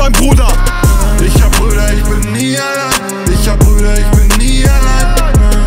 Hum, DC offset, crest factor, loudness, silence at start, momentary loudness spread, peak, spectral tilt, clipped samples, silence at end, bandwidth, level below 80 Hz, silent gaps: none; under 0.1%; 8 dB; -11 LUFS; 0 s; 4 LU; 0 dBFS; -4.5 dB/octave; under 0.1%; 0 s; 16.5 kHz; -8 dBFS; none